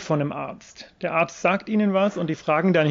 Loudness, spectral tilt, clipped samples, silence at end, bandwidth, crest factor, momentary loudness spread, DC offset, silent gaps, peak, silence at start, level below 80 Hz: -23 LUFS; -6.5 dB/octave; under 0.1%; 0 s; 7.6 kHz; 14 dB; 14 LU; under 0.1%; none; -8 dBFS; 0 s; -64 dBFS